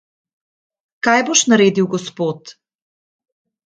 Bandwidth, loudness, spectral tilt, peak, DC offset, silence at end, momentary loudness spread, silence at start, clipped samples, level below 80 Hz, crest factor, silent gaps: 10 kHz; -15 LUFS; -3.5 dB/octave; 0 dBFS; under 0.1%; 1.15 s; 11 LU; 1.05 s; under 0.1%; -64 dBFS; 20 dB; none